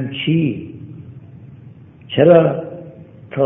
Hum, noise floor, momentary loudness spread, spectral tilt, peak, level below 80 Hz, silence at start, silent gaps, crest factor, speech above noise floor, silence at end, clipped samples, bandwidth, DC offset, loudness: none; -40 dBFS; 26 LU; -11.5 dB/octave; 0 dBFS; -56 dBFS; 0 s; none; 18 dB; 27 dB; 0 s; under 0.1%; 3.8 kHz; under 0.1%; -15 LUFS